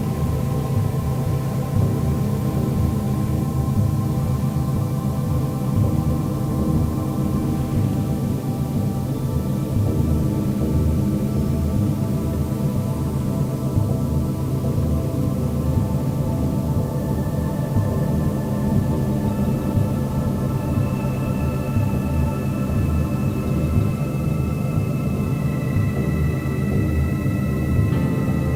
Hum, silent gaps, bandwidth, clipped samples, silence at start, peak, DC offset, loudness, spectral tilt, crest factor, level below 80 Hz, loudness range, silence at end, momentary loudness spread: none; none; 16.5 kHz; under 0.1%; 0 s; -6 dBFS; under 0.1%; -22 LUFS; -8 dB/octave; 14 dB; -32 dBFS; 1 LU; 0 s; 2 LU